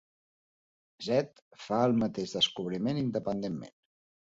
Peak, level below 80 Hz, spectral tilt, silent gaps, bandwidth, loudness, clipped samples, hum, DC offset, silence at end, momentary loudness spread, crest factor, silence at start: -14 dBFS; -64 dBFS; -5.5 dB/octave; 1.42-1.51 s; 7.8 kHz; -31 LUFS; under 0.1%; none; under 0.1%; 0.65 s; 14 LU; 20 dB; 1 s